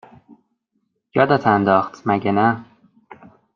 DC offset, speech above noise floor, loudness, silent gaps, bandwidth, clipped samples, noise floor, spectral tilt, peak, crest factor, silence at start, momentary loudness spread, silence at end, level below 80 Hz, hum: under 0.1%; 54 dB; -18 LUFS; none; 6.8 kHz; under 0.1%; -71 dBFS; -8 dB/octave; -2 dBFS; 18 dB; 1.15 s; 7 LU; 0.4 s; -62 dBFS; none